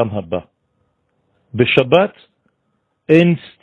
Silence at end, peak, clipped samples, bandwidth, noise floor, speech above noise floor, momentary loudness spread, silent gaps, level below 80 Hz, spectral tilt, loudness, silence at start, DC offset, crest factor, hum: 0.25 s; 0 dBFS; under 0.1%; 6.8 kHz; -68 dBFS; 53 dB; 15 LU; none; -54 dBFS; -8 dB/octave; -15 LUFS; 0 s; under 0.1%; 18 dB; none